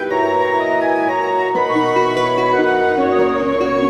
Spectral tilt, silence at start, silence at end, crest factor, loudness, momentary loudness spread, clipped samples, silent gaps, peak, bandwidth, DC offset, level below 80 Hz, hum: -5.5 dB/octave; 0 s; 0 s; 14 dB; -16 LUFS; 2 LU; under 0.1%; none; -2 dBFS; 11.5 kHz; under 0.1%; -50 dBFS; none